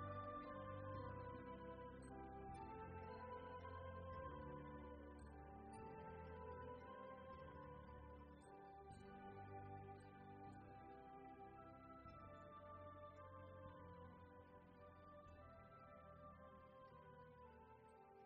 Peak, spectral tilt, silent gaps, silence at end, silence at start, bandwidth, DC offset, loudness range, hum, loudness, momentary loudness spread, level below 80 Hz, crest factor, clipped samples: -42 dBFS; -6.5 dB/octave; none; 0 s; 0 s; 4.8 kHz; under 0.1%; 8 LU; none; -59 LUFS; 10 LU; -70 dBFS; 16 dB; under 0.1%